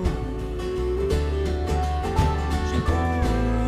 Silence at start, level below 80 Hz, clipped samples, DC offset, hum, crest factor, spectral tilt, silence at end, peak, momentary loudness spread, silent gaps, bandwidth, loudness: 0 s; -26 dBFS; under 0.1%; under 0.1%; none; 16 dB; -7 dB/octave; 0 s; -8 dBFS; 5 LU; none; 13 kHz; -25 LUFS